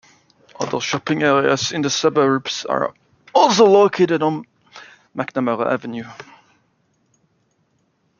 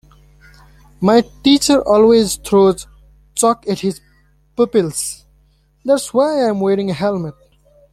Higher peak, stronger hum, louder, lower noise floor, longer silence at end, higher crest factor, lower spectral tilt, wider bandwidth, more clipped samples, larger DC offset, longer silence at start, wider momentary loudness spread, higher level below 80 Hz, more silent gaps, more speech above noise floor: about the same, 0 dBFS vs 0 dBFS; neither; second, -18 LUFS vs -15 LUFS; first, -65 dBFS vs -55 dBFS; first, 1.95 s vs 0.6 s; about the same, 18 dB vs 16 dB; about the same, -4 dB/octave vs -4.5 dB/octave; second, 7.2 kHz vs 15 kHz; neither; neither; second, 0.6 s vs 1 s; about the same, 16 LU vs 14 LU; second, -64 dBFS vs -46 dBFS; neither; first, 47 dB vs 41 dB